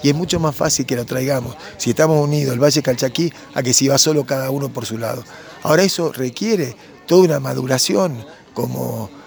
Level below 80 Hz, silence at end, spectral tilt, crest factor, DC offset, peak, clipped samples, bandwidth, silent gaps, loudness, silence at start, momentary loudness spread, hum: -50 dBFS; 0 s; -4.5 dB/octave; 18 dB; under 0.1%; 0 dBFS; under 0.1%; over 20 kHz; none; -17 LUFS; 0 s; 12 LU; none